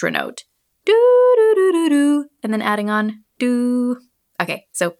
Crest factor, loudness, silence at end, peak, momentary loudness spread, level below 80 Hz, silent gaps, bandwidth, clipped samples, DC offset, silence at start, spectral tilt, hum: 16 dB; -17 LUFS; 0.1 s; 0 dBFS; 13 LU; -78 dBFS; none; 14.5 kHz; under 0.1%; under 0.1%; 0 s; -5 dB/octave; none